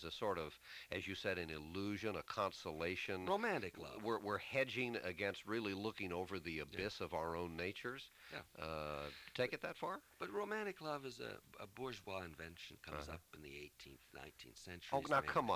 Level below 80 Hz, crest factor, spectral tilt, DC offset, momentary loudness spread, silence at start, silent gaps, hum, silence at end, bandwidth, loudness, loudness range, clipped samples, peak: -66 dBFS; 22 dB; -5 dB/octave; under 0.1%; 14 LU; 0 s; none; none; 0 s; 16 kHz; -44 LUFS; 8 LU; under 0.1%; -22 dBFS